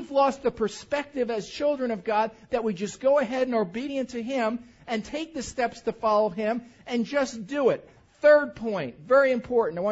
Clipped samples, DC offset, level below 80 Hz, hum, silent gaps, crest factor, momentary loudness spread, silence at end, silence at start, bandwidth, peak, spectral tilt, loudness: under 0.1%; under 0.1%; -58 dBFS; none; none; 18 dB; 10 LU; 0 s; 0 s; 8 kHz; -8 dBFS; -5 dB/octave; -26 LUFS